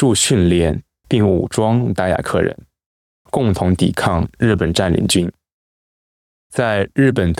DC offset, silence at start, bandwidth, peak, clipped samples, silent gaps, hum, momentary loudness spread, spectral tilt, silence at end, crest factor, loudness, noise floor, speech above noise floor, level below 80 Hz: under 0.1%; 0 s; 15.5 kHz; -4 dBFS; under 0.1%; 2.86-3.25 s, 5.53-6.50 s; none; 7 LU; -5.5 dB/octave; 0.05 s; 14 dB; -17 LUFS; under -90 dBFS; over 75 dB; -40 dBFS